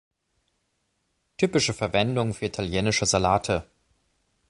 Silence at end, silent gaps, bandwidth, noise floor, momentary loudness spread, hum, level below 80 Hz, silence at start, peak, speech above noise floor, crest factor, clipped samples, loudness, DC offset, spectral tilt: 0.85 s; none; 11.5 kHz; -74 dBFS; 7 LU; none; -48 dBFS; 1.4 s; -6 dBFS; 50 dB; 20 dB; under 0.1%; -24 LUFS; under 0.1%; -4 dB/octave